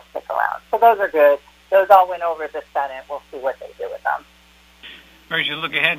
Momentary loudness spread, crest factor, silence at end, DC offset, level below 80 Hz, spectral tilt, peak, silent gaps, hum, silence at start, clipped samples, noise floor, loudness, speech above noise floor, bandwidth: 18 LU; 20 dB; 0 s; under 0.1%; -58 dBFS; -4 dB/octave; 0 dBFS; none; none; 0.15 s; under 0.1%; -51 dBFS; -19 LUFS; 33 dB; 15.5 kHz